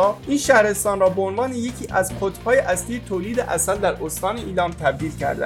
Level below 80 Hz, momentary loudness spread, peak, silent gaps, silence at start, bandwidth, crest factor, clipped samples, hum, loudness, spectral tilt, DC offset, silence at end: -42 dBFS; 9 LU; -2 dBFS; none; 0 s; 17 kHz; 20 dB; under 0.1%; none; -21 LUFS; -4 dB/octave; under 0.1%; 0 s